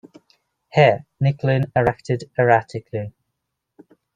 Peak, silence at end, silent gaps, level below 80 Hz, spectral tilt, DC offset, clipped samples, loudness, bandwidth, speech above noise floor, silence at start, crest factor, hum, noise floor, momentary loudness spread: -2 dBFS; 1.05 s; none; -52 dBFS; -7.5 dB/octave; under 0.1%; under 0.1%; -20 LUFS; 9 kHz; 59 dB; 0.75 s; 20 dB; none; -78 dBFS; 14 LU